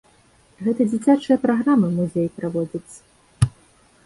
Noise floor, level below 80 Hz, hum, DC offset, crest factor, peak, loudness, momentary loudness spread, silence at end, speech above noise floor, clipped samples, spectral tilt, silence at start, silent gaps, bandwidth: -56 dBFS; -44 dBFS; none; under 0.1%; 18 dB; -2 dBFS; -21 LUFS; 9 LU; 0.55 s; 36 dB; under 0.1%; -7.5 dB/octave; 0.6 s; none; 11.5 kHz